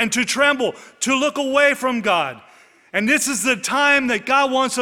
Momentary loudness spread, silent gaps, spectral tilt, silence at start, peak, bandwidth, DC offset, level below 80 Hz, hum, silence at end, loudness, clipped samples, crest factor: 7 LU; none; -2 dB/octave; 0 s; -2 dBFS; 19.5 kHz; under 0.1%; -62 dBFS; none; 0 s; -18 LUFS; under 0.1%; 18 dB